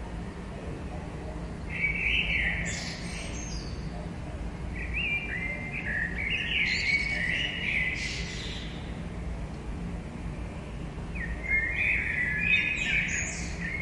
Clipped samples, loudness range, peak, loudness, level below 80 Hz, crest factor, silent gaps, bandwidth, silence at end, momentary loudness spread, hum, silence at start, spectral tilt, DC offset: under 0.1%; 6 LU; -14 dBFS; -30 LUFS; -40 dBFS; 18 dB; none; 11.5 kHz; 0 s; 13 LU; none; 0 s; -3.5 dB/octave; under 0.1%